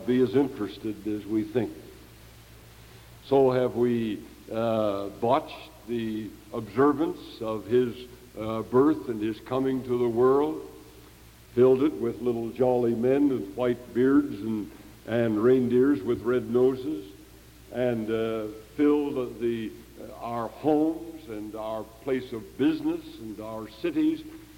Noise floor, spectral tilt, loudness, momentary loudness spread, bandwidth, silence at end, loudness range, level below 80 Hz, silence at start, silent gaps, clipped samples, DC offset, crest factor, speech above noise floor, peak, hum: -51 dBFS; -7.5 dB/octave; -27 LUFS; 15 LU; 17 kHz; 0.05 s; 5 LU; -56 dBFS; 0 s; none; under 0.1%; under 0.1%; 18 dB; 25 dB; -10 dBFS; none